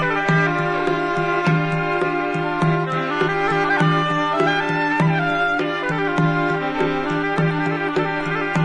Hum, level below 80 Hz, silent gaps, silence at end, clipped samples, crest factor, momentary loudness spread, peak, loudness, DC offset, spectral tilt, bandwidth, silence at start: none; -48 dBFS; none; 0 s; under 0.1%; 14 dB; 4 LU; -6 dBFS; -20 LUFS; under 0.1%; -7 dB/octave; 9.8 kHz; 0 s